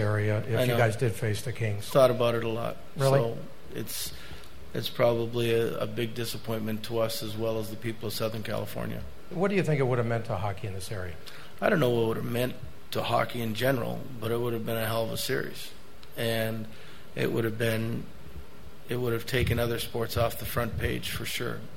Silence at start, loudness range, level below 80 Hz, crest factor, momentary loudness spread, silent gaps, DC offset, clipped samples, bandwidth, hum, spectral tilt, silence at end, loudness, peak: 0 s; 4 LU; -50 dBFS; 22 dB; 15 LU; none; 1%; under 0.1%; 16.5 kHz; none; -5.5 dB/octave; 0 s; -29 LUFS; -8 dBFS